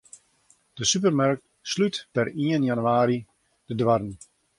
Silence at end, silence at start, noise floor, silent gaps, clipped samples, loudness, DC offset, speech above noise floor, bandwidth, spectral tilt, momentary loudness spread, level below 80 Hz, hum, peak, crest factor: 0.45 s; 0.75 s; -63 dBFS; none; under 0.1%; -24 LUFS; under 0.1%; 39 dB; 11.5 kHz; -4.5 dB/octave; 10 LU; -60 dBFS; none; -8 dBFS; 18 dB